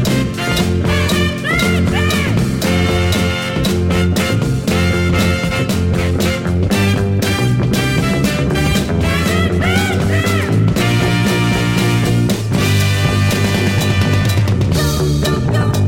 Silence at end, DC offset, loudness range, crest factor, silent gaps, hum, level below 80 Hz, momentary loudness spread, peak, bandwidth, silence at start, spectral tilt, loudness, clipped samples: 0 s; under 0.1%; 1 LU; 12 dB; none; none; -28 dBFS; 2 LU; -2 dBFS; 16.5 kHz; 0 s; -5.5 dB/octave; -15 LUFS; under 0.1%